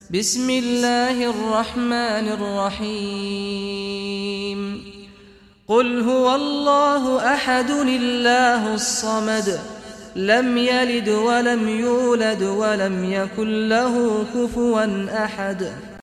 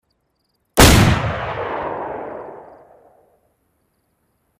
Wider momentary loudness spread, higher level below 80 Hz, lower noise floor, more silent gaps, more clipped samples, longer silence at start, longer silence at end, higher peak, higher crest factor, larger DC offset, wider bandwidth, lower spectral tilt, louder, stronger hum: second, 9 LU vs 22 LU; second, -52 dBFS vs -28 dBFS; second, -48 dBFS vs -68 dBFS; neither; neither; second, 0.1 s vs 0.75 s; second, 0 s vs 1.95 s; about the same, -4 dBFS vs -2 dBFS; about the same, 16 dB vs 18 dB; neither; second, 14.5 kHz vs 16 kHz; about the same, -3.5 dB/octave vs -4.5 dB/octave; second, -20 LUFS vs -16 LUFS; neither